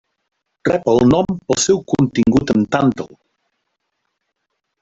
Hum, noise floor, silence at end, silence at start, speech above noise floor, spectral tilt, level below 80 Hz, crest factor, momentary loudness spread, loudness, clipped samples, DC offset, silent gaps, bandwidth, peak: none; -74 dBFS; 1.75 s; 0.65 s; 59 dB; -5.5 dB/octave; -44 dBFS; 16 dB; 8 LU; -16 LUFS; under 0.1%; under 0.1%; none; 8.4 kHz; -2 dBFS